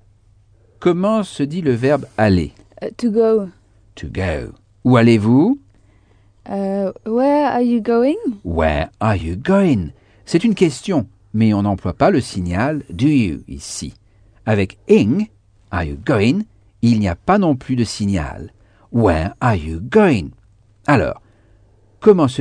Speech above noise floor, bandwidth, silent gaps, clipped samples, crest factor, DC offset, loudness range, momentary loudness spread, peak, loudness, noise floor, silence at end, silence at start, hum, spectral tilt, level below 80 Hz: 36 dB; 10 kHz; none; under 0.1%; 18 dB; under 0.1%; 2 LU; 14 LU; 0 dBFS; -17 LUFS; -52 dBFS; 0 s; 0.8 s; none; -7 dB/octave; -38 dBFS